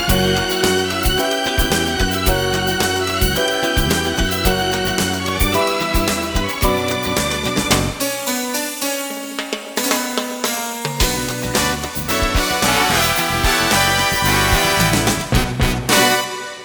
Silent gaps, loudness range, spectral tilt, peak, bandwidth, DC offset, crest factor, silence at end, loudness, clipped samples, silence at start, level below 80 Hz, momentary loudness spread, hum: none; 5 LU; -3 dB/octave; 0 dBFS; over 20 kHz; under 0.1%; 18 dB; 0 s; -17 LUFS; under 0.1%; 0 s; -28 dBFS; 7 LU; none